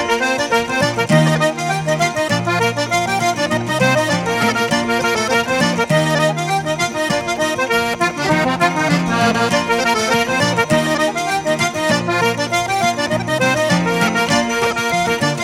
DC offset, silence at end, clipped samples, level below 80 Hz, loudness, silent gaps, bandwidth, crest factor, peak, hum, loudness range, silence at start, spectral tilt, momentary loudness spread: under 0.1%; 0 s; under 0.1%; -48 dBFS; -16 LUFS; none; 16.5 kHz; 16 dB; -2 dBFS; none; 1 LU; 0 s; -4 dB/octave; 3 LU